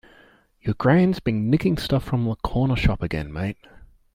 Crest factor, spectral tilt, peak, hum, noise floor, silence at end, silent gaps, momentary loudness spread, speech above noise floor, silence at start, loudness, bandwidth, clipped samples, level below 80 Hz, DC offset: 18 dB; -8 dB/octave; -4 dBFS; none; -55 dBFS; 0.3 s; none; 11 LU; 34 dB; 0.65 s; -23 LUFS; 15.5 kHz; under 0.1%; -36 dBFS; under 0.1%